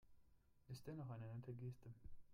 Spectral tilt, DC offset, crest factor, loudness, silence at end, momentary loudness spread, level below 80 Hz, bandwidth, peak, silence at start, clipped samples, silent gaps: -7.5 dB/octave; under 0.1%; 14 dB; -55 LUFS; 0 s; 9 LU; -70 dBFS; 15.5 kHz; -42 dBFS; 0 s; under 0.1%; none